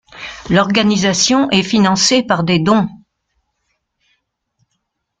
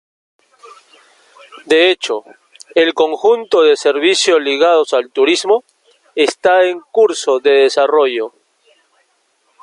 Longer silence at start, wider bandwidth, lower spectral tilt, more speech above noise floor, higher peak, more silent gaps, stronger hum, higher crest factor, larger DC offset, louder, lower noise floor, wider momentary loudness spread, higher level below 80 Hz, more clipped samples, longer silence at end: second, 0.15 s vs 1.65 s; second, 9.4 kHz vs 11.5 kHz; first, -4 dB/octave vs -1.5 dB/octave; first, 58 dB vs 48 dB; about the same, 0 dBFS vs 0 dBFS; neither; neither; about the same, 16 dB vs 14 dB; neither; about the same, -13 LUFS vs -13 LUFS; first, -71 dBFS vs -61 dBFS; about the same, 6 LU vs 7 LU; first, -48 dBFS vs -68 dBFS; neither; first, 2.25 s vs 1.35 s